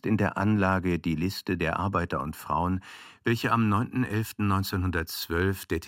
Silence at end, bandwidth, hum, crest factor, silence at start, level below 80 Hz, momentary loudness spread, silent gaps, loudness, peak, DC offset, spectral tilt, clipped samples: 0 s; 16.5 kHz; none; 18 dB; 0.05 s; -48 dBFS; 6 LU; none; -28 LUFS; -8 dBFS; under 0.1%; -6.5 dB/octave; under 0.1%